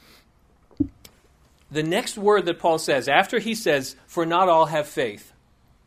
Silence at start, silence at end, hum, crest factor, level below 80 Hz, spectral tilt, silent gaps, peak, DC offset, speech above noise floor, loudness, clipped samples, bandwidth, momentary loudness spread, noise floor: 0.8 s; 0.65 s; none; 22 dB; -56 dBFS; -4 dB/octave; none; -2 dBFS; under 0.1%; 37 dB; -22 LUFS; under 0.1%; 15.5 kHz; 11 LU; -59 dBFS